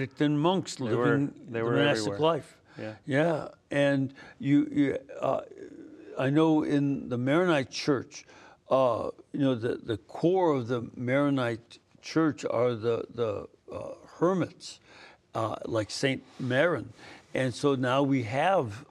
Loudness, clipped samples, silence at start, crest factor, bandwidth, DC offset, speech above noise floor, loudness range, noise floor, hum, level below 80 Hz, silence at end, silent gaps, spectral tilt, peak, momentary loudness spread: -28 LUFS; under 0.1%; 0 s; 18 dB; 11.5 kHz; under 0.1%; 26 dB; 4 LU; -54 dBFS; none; -70 dBFS; 0.05 s; none; -6.5 dB/octave; -10 dBFS; 15 LU